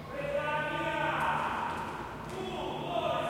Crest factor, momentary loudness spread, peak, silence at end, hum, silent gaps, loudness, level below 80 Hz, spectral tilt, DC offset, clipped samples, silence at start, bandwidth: 16 dB; 9 LU; -18 dBFS; 0 s; none; none; -33 LUFS; -56 dBFS; -5 dB/octave; under 0.1%; under 0.1%; 0 s; 16.5 kHz